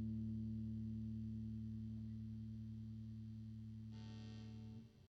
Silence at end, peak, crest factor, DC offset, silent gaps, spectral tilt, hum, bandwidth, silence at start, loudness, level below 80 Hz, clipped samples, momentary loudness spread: 0 s; -38 dBFS; 12 dB; under 0.1%; none; -9 dB/octave; 50 Hz at -75 dBFS; 6.4 kHz; 0 s; -50 LUFS; -62 dBFS; under 0.1%; 8 LU